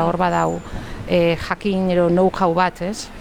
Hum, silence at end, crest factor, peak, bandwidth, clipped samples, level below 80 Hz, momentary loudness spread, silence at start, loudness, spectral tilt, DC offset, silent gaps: none; 0 s; 14 dB; -4 dBFS; 14 kHz; under 0.1%; -38 dBFS; 11 LU; 0 s; -19 LUFS; -6.5 dB/octave; under 0.1%; none